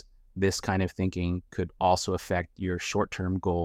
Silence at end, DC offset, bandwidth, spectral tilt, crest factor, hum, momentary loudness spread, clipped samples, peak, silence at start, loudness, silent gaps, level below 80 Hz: 0 s; under 0.1%; 16 kHz; -5.5 dB/octave; 18 dB; none; 7 LU; under 0.1%; -10 dBFS; 0.35 s; -29 LUFS; none; -48 dBFS